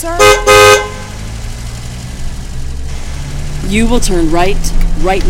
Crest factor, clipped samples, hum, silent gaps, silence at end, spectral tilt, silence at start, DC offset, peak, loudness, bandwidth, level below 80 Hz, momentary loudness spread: 10 dB; 0.3%; none; none; 0 s; -3.5 dB/octave; 0 s; under 0.1%; 0 dBFS; -10 LUFS; 17 kHz; -16 dBFS; 20 LU